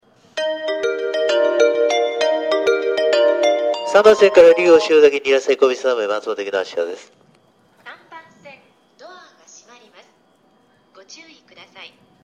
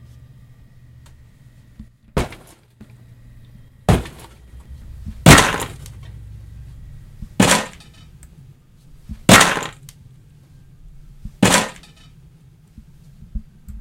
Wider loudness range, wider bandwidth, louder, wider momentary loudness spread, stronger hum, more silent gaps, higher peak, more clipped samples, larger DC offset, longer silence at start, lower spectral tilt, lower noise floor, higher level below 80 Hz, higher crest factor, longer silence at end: first, 15 LU vs 10 LU; second, 9.8 kHz vs 16.5 kHz; about the same, -16 LUFS vs -15 LUFS; second, 13 LU vs 29 LU; neither; neither; about the same, 0 dBFS vs 0 dBFS; neither; neither; second, 0.35 s vs 1.8 s; about the same, -3 dB/octave vs -3.5 dB/octave; first, -57 dBFS vs -48 dBFS; second, -62 dBFS vs -34 dBFS; about the same, 18 dB vs 22 dB; first, 0.35 s vs 0 s